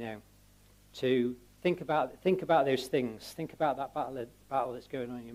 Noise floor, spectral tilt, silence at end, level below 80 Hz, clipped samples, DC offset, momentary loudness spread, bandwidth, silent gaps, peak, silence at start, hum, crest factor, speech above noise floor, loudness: -61 dBFS; -6 dB/octave; 0 s; -66 dBFS; under 0.1%; under 0.1%; 14 LU; 16 kHz; none; -14 dBFS; 0 s; 50 Hz at -60 dBFS; 18 dB; 29 dB; -32 LUFS